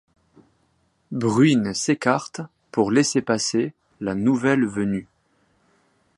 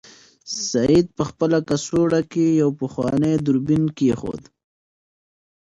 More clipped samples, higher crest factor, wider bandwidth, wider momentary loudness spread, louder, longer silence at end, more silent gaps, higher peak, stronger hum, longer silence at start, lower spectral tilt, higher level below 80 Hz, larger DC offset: neither; about the same, 20 dB vs 16 dB; about the same, 11.5 kHz vs 10.5 kHz; first, 12 LU vs 9 LU; about the same, -22 LUFS vs -20 LUFS; second, 1.15 s vs 1.4 s; neither; first, -2 dBFS vs -6 dBFS; neither; first, 1.1 s vs 0.45 s; about the same, -5 dB/octave vs -6 dB/octave; second, -60 dBFS vs -50 dBFS; neither